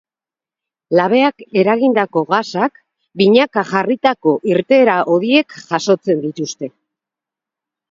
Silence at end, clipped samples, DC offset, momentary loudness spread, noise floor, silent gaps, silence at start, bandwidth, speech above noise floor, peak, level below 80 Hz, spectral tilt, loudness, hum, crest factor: 1.25 s; under 0.1%; under 0.1%; 9 LU; -90 dBFS; none; 0.9 s; 7.6 kHz; 75 dB; 0 dBFS; -64 dBFS; -5.5 dB/octave; -15 LUFS; none; 16 dB